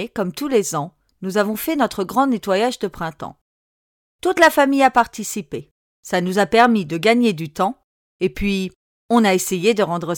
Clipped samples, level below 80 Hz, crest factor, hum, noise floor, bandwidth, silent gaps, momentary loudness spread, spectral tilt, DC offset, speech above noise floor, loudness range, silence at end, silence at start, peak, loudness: under 0.1%; -46 dBFS; 16 dB; none; under -90 dBFS; 19 kHz; 3.41-4.19 s, 5.71-6.03 s, 7.84-8.19 s, 8.76-9.09 s; 14 LU; -4.5 dB/octave; under 0.1%; over 72 dB; 5 LU; 0 s; 0 s; -2 dBFS; -19 LUFS